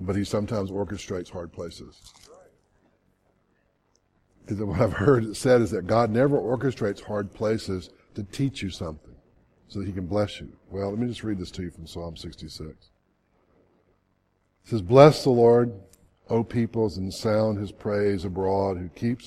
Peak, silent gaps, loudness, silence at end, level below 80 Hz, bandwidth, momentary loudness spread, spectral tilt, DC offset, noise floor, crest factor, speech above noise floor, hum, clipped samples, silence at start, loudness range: 0 dBFS; none; -24 LUFS; 0 s; -52 dBFS; 13.5 kHz; 19 LU; -7 dB/octave; under 0.1%; -70 dBFS; 26 dB; 45 dB; none; under 0.1%; 0 s; 17 LU